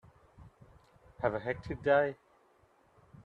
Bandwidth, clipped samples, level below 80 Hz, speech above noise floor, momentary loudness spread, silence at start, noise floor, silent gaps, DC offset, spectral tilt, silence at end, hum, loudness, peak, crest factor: 6 kHz; under 0.1%; -60 dBFS; 36 dB; 9 LU; 0.4 s; -67 dBFS; none; under 0.1%; -7.5 dB/octave; 0.05 s; none; -32 LUFS; -14 dBFS; 22 dB